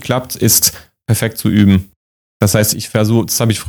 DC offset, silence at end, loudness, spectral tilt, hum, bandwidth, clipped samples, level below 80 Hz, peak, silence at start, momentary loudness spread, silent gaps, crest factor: under 0.1%; 0 s; -13 LUFS; -4.5 dB/octave; none; over 20 kHz; under 0.1%; -42 dBFS; 0 dBFS; 0 s; 7 LU; 1.96-2.40 s; 14 dB